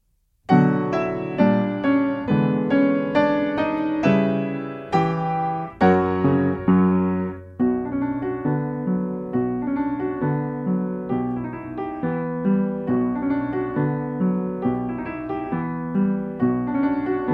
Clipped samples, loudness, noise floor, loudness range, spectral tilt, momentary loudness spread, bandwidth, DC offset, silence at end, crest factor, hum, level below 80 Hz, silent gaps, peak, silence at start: under 0.1%; -22 LUFS; -43 dBFS; 4 LU; -9.5 dB/octave; 8 LU; 6.6 kHz; under 0.1%; 0 s; 18 dB; none; -52 dBFS; none; -4 dBFS; 0.5 s